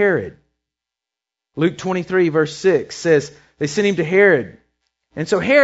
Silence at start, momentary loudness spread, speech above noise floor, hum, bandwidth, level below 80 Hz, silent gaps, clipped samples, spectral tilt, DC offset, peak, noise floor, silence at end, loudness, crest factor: 0 s; 20 LU; 70 dB; none; 8 kHz; -58 dBFS; none; under 0.1%; -5.5 dB/octave; under 0.1%; 0 dBFS; -86 dBFS; 0 s; -18 LUFS; 18 dB